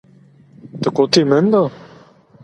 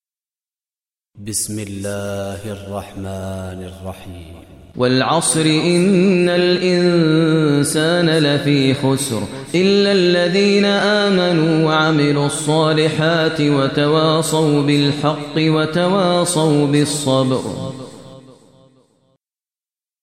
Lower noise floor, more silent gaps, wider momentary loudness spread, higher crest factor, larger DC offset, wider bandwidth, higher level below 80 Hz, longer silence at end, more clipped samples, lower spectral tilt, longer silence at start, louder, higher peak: second, -47 dBFS vs under -90 dBFS; neither; second, 10 LU vs 14 LU; about the same, 18 dB vs 14 dB; neither; second, 11.5 kHz vs 15 kHz; second, -60 dBFS vs -54 dBFS; second, 0.7 s vs 1.8 s; neither; about the same, -5.5 dB/octave vs -5 dB/octave; second, 0.65 s vs 1.15 s; about the same, -15 LUFS vs -15 LUFS; about the same, 0 dBFS vs -2 dBFS